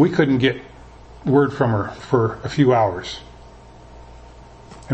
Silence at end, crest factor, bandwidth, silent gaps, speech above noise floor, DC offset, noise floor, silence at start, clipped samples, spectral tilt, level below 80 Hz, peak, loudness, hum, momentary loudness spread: 0 s; 18 dB; 8.6 kHz; none; 25 dB; under 0.1%; -43 dBFS; 0 s; under 0.1%; -7.5 dB/octave; -46 dBFS; -2 dBFS; -19 LUFS; none; 14 LU